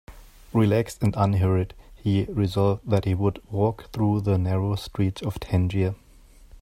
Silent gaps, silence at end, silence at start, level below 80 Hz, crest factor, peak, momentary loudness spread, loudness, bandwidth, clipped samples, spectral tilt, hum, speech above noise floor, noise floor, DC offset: none; 0.65 s; 0.1 s; -46 dBFS; 18 dB; -6 dBFS; 6 LU; -25 LUFS; 14 kHz; under 0.1%; -8 dB/octave; none; 28 dB; -51 dBFS; under 0.1%